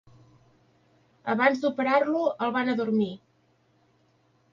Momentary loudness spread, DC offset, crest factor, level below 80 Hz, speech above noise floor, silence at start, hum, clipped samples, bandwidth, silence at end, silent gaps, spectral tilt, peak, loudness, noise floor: 9 LU; under 0.1%; 22 dB; -74 dBFS; 41 dB; 1.25 s; none; under 0.1%; 7.4 kHz; 1.35 s; none; -6.5 dB/octave; -8 dBFS; -26 LUFS; -66 dBFS